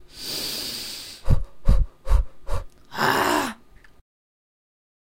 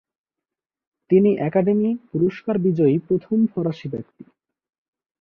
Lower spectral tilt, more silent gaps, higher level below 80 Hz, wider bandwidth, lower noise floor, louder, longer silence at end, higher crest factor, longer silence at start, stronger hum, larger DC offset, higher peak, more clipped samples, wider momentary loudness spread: second, -4 dB/octave vs -10.5 dB/octave; neither; first, -26 dBFS vs -62 dBFS; first, 16 kHz vs 5.6 kHz; second, -48 dBFS vs -87 dBFS; second, -26 LUFS vs -20 LUFS; first, 1.45 s vs 1.2 s; about the same, 20 dB vs 16 dB; second, 0.15 s vs 1.1 s; neither; neither; about the same, -4 dBFS vs -4 dBFS; neither; first, 14 LU vs 9 LU